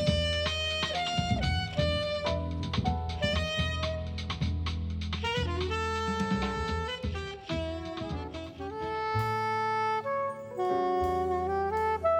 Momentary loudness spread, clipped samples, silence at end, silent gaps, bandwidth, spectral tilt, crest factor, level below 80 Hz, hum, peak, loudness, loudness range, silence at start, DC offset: 7 LU; under 0.1%; 0 s; none; 11.5 kHz; -5.5 dB/octave; 18 dB; -42 dBFS; none; -14 dBFS; -31 LUFS; 3 LU; 0 s; under 0.1%